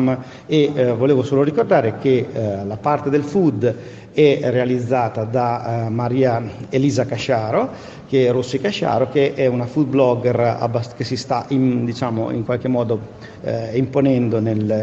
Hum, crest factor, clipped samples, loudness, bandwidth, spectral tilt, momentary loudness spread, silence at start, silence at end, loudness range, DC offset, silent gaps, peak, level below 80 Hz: none; 16 dB; under 0.1%; -19 LUFS; 8 kHz; -7.5 dB/octave; 7 LU; 0 s; 0 s; 2 LU; under 0.1%; none; -2 dBFS; -54 dBFS